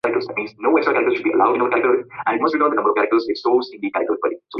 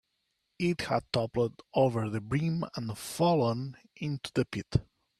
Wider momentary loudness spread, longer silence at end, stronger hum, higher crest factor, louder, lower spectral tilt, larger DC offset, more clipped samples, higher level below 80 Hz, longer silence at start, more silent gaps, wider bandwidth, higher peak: second, 6 LU vs 10 LU; second, 0 s vs 0.35 s; neither; about the same, 16 dB vs 18 dB; first, -19 LUFS vs -31 LUFS; about the same, -6.5 dB/octave vs -6.5 dB/octave; neither; neither; second, -64 dBFS vs -56 dBFS; second, 0.05 s vs 0.6 s; neither; second, 6 kHz vs 14 kHz; first, -2 dBFS vs -12 dBFS